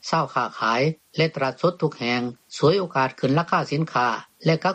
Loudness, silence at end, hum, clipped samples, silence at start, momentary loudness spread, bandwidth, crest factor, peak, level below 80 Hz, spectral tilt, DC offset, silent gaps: -23 LUFS; 0 s; none; under 0.1%; 0.05 s; 4 LU; 9 kHz; 18 dB; -6 dBFS; -64 dBFS; -6 dB/octave; under 0.1%; none